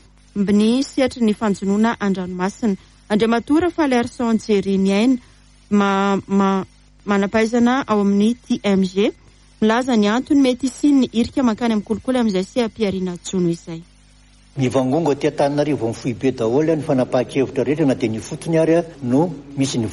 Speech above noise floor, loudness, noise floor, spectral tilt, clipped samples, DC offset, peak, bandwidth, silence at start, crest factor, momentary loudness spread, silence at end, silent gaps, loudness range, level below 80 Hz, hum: 31 dB; -19 LUFS; -49 dBFS; -6 dB/octave; under 0.1%; under 0.1%; -4 dBFS; 11.5 kHz; 0.35 s; 14 dB; 7 LU; 0 s; none; 3 LU; -50 dBFS; none